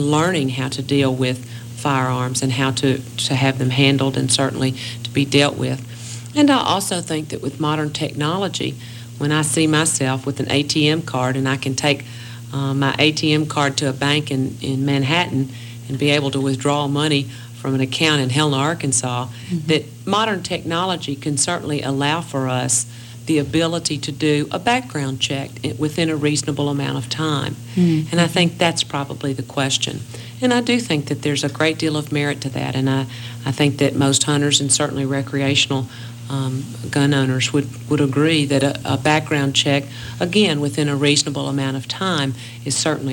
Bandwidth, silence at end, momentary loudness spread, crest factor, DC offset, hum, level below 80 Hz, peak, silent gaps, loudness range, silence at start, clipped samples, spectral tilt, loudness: 18 kHz; 0 s; 9 LU; 18 dB; under 0.1%; none; -54 dBFS; 0 dBFS; none; 2 LU; 0 s; under 0.1%; -4.5 dB/octave; -19 LUFS